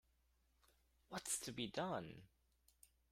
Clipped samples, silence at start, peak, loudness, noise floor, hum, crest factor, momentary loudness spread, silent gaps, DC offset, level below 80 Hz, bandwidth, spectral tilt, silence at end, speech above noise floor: under 0.1%; 1.1 s; -30 dBFS; -46 LUFS; -79 dBFS; none; 20 dB; 13 LU; none; under 0.1%; -76 dBFS; 16 kHz; -3 dB/octave; 0.25 s; 33 dB